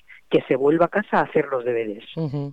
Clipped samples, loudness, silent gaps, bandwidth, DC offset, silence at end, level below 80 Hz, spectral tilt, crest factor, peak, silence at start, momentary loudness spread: under 0.1%; -22 LUFS; none; 5.4 kHz; 0.2%; 0 s; -60 dBFS; -8.5 dB/octave; 16 dB; -6 dBFS; 0.1 s; 10 LU